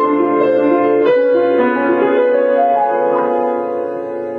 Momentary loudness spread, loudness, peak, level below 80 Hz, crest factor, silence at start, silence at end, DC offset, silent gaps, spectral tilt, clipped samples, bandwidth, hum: 7 LU; -14 LUFS; -2 dBFS; -64 dBFS; 12 dB; 0 s; 0 s; under 0.1%; none; -8 dB/octave; under 0.1%; 4.5 kHz; none